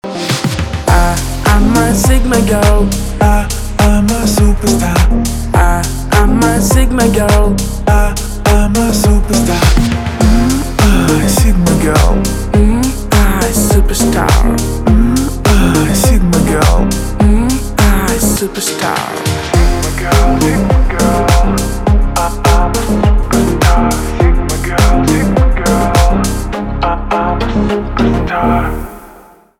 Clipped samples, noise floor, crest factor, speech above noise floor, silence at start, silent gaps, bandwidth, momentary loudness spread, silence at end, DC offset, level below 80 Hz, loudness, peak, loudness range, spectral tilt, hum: under 0.1%; -39 dBFS; 10 dB; 30 dB; 0.05 s; none; 16.5 kHz; 5 LU; 0.45 s; under 0.1%; -14 dBFS; -12 LUFS; 0 dBFS; 2 LU; -5.5 dB/octave; none